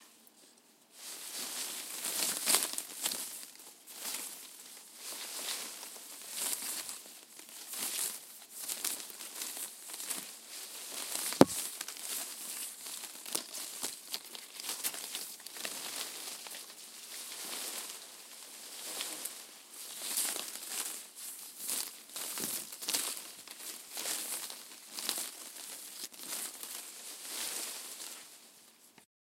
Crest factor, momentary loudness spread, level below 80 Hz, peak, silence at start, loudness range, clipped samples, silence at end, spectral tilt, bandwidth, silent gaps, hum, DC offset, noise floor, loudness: 40 dB; 13 LU; -82 dBFS; 0 dBFS; 0 s; 7 LU; under 0.1%; 0.3 s; -1.5 dB/octave; 17 kHz; none; none; under 0.1%; -63 dBFS; -37 LUFS